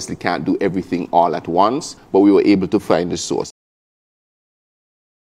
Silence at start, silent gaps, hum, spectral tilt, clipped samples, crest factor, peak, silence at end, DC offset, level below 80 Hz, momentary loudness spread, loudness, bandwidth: 0 s; none; none; -5.5 dB/octave; under 0.1%; 18 dB; 0 dBFS; 1.75 s; under 0.1%; -54 dBFS; 10 LU; -17 LUFS; 12 kHz